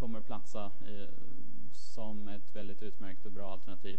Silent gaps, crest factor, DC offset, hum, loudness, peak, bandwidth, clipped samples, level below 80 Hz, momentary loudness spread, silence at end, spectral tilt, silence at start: none; 20 dB; 8%; none; -48 LUFS; -18 dBFS; 8.4 kHz; under 0.1%; -64 dBFS; 9 LU; 0 s; -6.5 dB/octave; 0 s